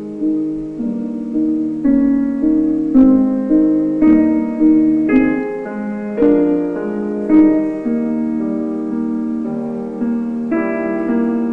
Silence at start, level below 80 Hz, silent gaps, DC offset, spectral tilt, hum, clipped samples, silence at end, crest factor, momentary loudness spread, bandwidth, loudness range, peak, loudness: 0 s; -44 dBFS; none; under 0.1%; -9.5 dB/octave; none; under 0.1%; 0 s; 14 dB; 10 LU; 3.1 kHz; 6 LU; 0 dBFS; -16 LUFS